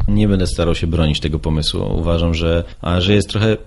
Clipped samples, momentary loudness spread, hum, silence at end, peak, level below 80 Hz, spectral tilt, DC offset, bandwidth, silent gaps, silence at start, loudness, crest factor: under 0.1%; 4 LU; none; 0 s; -2 dBFS; -24 dBFS; -6 dB/octave; under 0.1%; 11.5 kHz; none; 0 s; -17 LUFS; 14 dB